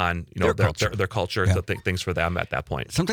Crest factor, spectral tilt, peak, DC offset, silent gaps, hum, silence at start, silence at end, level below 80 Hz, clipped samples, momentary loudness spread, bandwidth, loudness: 18 dB; -5.5 dB/octave; -6 dBFS; under 0.1%; none; none; 0 s; 0 s; -44 dBFS; under 0.1%; 6 LU; 18.5 kHz; -25 LUFS